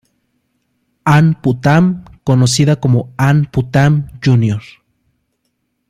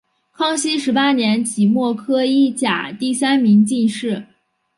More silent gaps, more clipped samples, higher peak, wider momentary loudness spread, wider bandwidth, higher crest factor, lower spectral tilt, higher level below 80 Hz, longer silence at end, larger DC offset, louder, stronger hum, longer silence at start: neither; neither; first, 0 dBFS vs -4 dBFS; about the same, 6 LU vs 8 LU; first, 13 kHz vs 11.5 kHz; about the same, 12 dB vs 14 dB; first, -6.5 dB/octave vs -4.5 dB/octave; first, -44 dBFS vs -66 dBFS; first, 1.3 s vs 0.55 s; neither; first, -13 LUFS vs -17 LUFS; neither; first, 1.05 s vs 0.4 s